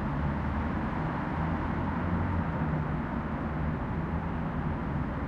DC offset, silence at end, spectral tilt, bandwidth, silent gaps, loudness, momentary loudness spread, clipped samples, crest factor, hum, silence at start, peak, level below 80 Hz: under 0.1%; 0 s; -9.5 dB/octave; 6.4 kHz; none; -32 LUFS; 2 LU; under 0.1%; 12 dB; none; 0 s; -18 dBFS; -38 dBFS